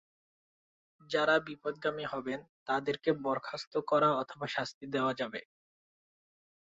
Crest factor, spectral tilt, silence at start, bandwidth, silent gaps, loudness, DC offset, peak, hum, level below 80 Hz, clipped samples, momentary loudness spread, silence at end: 20 dB; -3 dB/octave; 1.1 s; 7.6 kHz; 2.49-2.66 s, 3.67-3.71 s, 4.74-4.81 s; -33 LUFS; under 0.1%; -14 dBFS; none; -74 dBFS; under 0.1%; 10 LU; 1.25 s